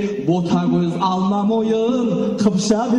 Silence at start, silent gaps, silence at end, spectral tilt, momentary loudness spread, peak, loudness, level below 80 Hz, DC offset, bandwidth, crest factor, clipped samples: 0 s; none; 0 s; -6.5 dB/octave; 2 LU; -6 dBFS; -18 LUFS; -52 dBFS; under 0.1%; 11 kHz; 12 dB; under 0.1%